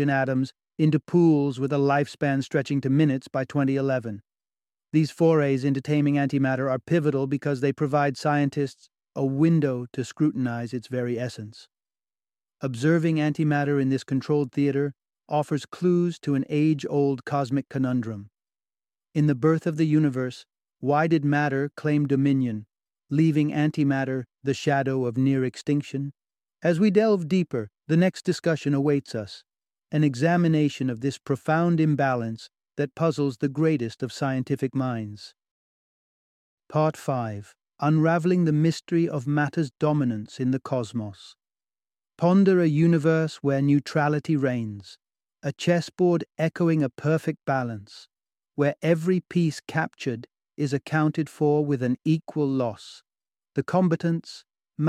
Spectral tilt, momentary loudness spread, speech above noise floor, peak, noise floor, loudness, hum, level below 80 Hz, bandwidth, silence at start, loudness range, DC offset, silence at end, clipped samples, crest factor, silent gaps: -7.5 dB/octave; 11 LU; over 66 dB; -6 dBFS; under -90 dBFS; -24 LUFS; none; -68 dBFS; 11 kHz; 0 s; 4 LU; under 0.1%; 0 s; under 0.1%; 18 dB; 35.51-36.57 s